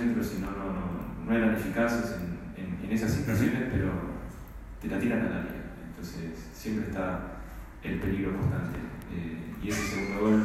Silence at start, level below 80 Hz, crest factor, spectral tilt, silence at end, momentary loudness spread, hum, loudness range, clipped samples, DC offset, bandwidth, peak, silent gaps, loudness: 0 s; -44 dBFS; 18 dB; -6.5 dB/octave; 0 s; 13 LU; none; 5 LU; under 0.1%; under 0.1%; 15.5 kHz; -12 dBFS; none; -32 LUFS